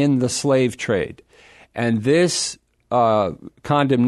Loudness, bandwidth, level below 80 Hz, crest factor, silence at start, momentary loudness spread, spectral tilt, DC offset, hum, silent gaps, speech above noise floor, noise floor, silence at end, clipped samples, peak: -20 LUFS; 12.5 kHz; -54 dBFS; 16 dB; 0 s; 12 LU; -5 dB/octave; under 0.1%; none; none; 31 dB; -50 dBFS; 0 s; under 0.1%; -4 dBFS